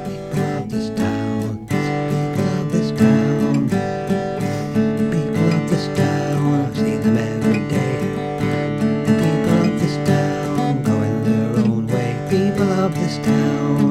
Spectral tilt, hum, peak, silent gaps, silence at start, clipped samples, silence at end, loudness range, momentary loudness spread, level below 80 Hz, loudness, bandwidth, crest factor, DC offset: -7.5 dB/octave; none; -2 dBFS; none; 0 s; under 0.1%; 0 s; 1 LU; 5 LU; -46 dBFS; -19 LUFS; 14.5 kHz; 16 dB; under 0.1%